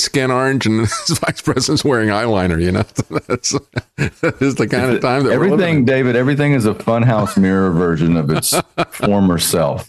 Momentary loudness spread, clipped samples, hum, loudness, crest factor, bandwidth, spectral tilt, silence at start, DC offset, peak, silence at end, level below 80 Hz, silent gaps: 5 LU; under 0.1%; none; -15 LUFS; 10 dB; 13.5 kHz; -5 dB/octave; 0 s; under 0.1%; -4 dBFS; 0.05 s; -42 dBFS; none